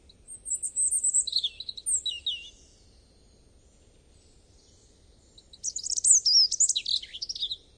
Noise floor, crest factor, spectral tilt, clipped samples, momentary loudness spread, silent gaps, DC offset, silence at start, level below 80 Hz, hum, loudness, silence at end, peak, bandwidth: -59 dBFS; 24 dB; 3.5 dB/octave; under 0.1%; 16 LU; none; under 0.1%; 0.3 s; -60 dBFS; none; -24 LUFS; 0.2 s; -6 dBFS; 11 kHz